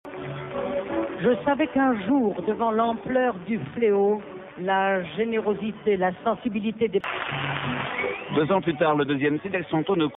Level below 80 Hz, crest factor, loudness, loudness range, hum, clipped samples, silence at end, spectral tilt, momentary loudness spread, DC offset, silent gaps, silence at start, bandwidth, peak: -58 dBFS; 16 dB; -25 LUFS; 2 LU; none; under 0.1%; 0 s; -4.5 dB/octave; 7 LU; under 0.1%; none; 0.05 s; 4 kHz; -10 dBFS